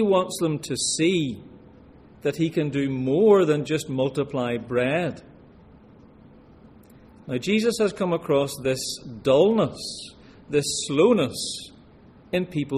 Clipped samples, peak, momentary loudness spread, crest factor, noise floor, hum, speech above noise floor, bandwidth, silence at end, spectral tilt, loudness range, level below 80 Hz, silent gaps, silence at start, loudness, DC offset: under 0.1%; -6 dBFS; 12 LU; 18 dB; -50 dBFS; none; 28 dB; 14.5 kHz; 0 s; -5 dB/octave; 6 LU; -56 dBFS; none; 0 s; -23 LUFS; under 0.1%